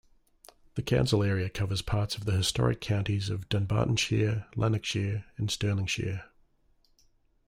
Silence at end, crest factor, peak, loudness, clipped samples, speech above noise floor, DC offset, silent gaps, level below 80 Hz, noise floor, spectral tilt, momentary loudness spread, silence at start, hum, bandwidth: 1.25 s; 18 dB; -12 dBFS; -29 LUFS; under 0.1%; 38 dB; under 0.1%; none; -50 dBFS; -66 dBFS; -5.5 dB/octave; 7 LU; 0.75 s; none; 15.5 kHz